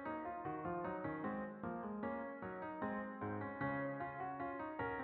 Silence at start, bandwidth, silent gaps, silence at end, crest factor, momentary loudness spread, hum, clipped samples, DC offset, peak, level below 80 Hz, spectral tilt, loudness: 0 s; 4.6 kHz; none; 0 s; 14 dB; 4 LU; none; under 0.1%; under 0.1%; -30 dBFS; -70 dBFS; -6.5 dB/octave; -45 LUFS